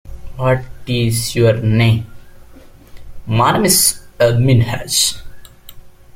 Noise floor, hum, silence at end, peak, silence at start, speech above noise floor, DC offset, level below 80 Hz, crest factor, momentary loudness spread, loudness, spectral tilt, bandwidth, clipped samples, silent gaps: -40 dBFS; none; 0.25 s; 0 dBFS; 0.05 s; 26 dB; under 0.1%; -36 dBFS; 16 dB; 10 LU; -14 LUFS; -4.5 dB/octave; 16.5 kHz; under 0.1%; none